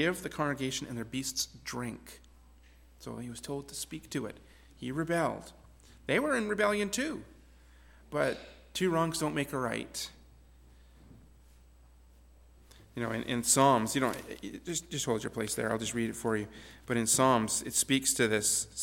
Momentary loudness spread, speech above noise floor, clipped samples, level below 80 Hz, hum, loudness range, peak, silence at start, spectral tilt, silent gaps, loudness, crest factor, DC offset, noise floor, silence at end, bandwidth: 17 LU; 26 dB; under 0.1%; -58 dBFS; none; 11 LU; -12 dBFS; 0 s; -3.5 dB/octave; none; -31 LUFS; 22 dB; under 0.1%; -58 dBFS; 0 s; 17.5 kHz